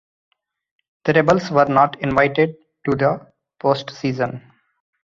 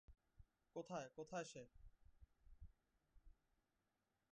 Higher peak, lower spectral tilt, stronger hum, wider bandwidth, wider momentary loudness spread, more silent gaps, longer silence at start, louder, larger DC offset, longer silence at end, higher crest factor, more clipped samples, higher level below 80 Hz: first, -2 dBFS vs -38 dBFS; first, -7 dB/octave vs -4.5 dB/octave; neither; second, 7.4 kHz vs 9.6 kHz; second, 10 LU vs 17 LU; neither; first, 1.05 s vs 0.1 s; first, -19 LUFS vs -54 LUFS; neither; second, 0.65 s vs 1 s; about the same, 18 dB vs 22 dB; neither; first, -52 dBFS vs -72 dBFS